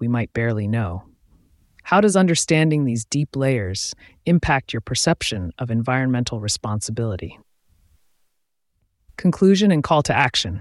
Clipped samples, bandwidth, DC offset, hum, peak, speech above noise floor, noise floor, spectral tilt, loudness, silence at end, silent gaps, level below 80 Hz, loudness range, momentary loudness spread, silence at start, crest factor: under 0.1%; 12 kHz; under 0.1%; none; -4 dBFS; 54 dB; -73 dBFS; -5 dB/octave; -20 LUFS; 0 s; none; -46 dBFS; 6 LU; 11 LU; 0 s; 18 dB